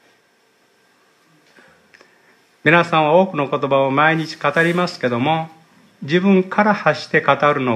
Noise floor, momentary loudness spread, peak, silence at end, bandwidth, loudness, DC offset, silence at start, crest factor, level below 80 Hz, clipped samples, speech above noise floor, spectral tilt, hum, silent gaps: -58 dBFS; 6 LU; 0 dBFS; 0 s; 11.5 kHz; -16 LUFS; under 0.1%; 2.65 s; 18 dB; -68 dBFS; under 0.1%; 42 dB; -6.5 dB/octave; none; none